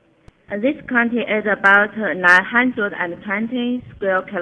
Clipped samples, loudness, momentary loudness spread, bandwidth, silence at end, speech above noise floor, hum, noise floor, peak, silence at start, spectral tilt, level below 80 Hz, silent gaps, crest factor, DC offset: under 0.1%; -17 LUFS; 11 LU; 10 kHz; 0 s; 32 dB; none; -50 dBFS; 0 dBFS; 0.5 s; -5.5 dB/octave; -56 dBFS; none; 18 dB; under 0.1%